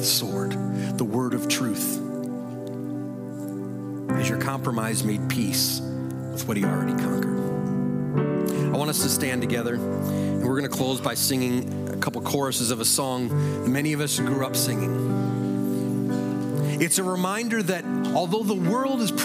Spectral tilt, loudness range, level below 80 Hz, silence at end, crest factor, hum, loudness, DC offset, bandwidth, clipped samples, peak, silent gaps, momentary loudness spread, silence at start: -4.5 dB/octave; 4 LU; -64 dBFS; 0 s; 18 dB; none; -25 LUFS; under 0.1%; 16.5 kHz; under 0.1%; -6 dBFS; none; 9 LU; 0 s